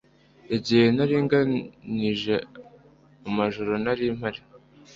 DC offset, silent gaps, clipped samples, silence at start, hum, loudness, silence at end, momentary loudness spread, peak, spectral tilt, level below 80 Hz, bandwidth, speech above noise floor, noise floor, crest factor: under 0.1%; none; under 0.1%; 0.5 s; none; -25 LUFS; 0.4 s; 13 LU; -6 dBFS; -7 dB/octave; -58 dBFS; 7.6 kHz; 30 dB; -54 dBFS; 18 dB